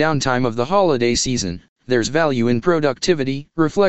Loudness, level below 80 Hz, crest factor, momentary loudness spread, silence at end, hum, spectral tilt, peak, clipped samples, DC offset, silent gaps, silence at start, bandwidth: -18 LUFS; -44 dBFS; 16 dB; 6 LU; 0 s; none; -4.5 dB/octave; -2 dBFS; under 0.1%; 2%; 1.69-1.76 s; 0 s; 8.4 kHz